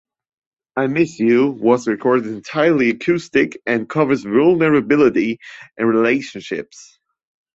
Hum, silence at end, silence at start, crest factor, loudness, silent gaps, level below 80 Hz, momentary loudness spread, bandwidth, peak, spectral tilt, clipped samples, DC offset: none; 0.75 s; 0.75 s; 16 dB; -17 LUFS; none; -58 dBFS; 13 LU; 7.8 kHz; -2 dBFS; -6.5 dB/octave; under 0.1%; under 0.1%